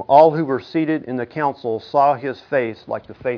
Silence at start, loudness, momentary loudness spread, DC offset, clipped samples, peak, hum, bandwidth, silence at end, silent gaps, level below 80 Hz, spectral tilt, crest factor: 0 s; -20 LUFS; 12 LU; under 0.1%; under 0.1%; 0 dBFS; none; 5.4 kHz; 0 s; none; -62 dBFS; -8.5 dB/octave; 18 dB